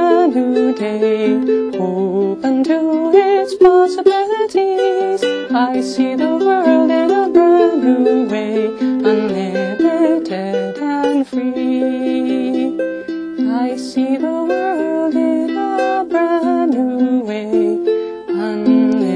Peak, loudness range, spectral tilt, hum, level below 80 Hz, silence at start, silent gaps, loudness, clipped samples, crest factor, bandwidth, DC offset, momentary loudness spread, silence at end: 0 dBFS; 5 LU; -6.5 dB/octave; none; -58 dBFS; 0 s; none; -15 LUFS; under 0.1%; 14 dB; 10.5 kHz; under 0.1%; 7 LU; 0 s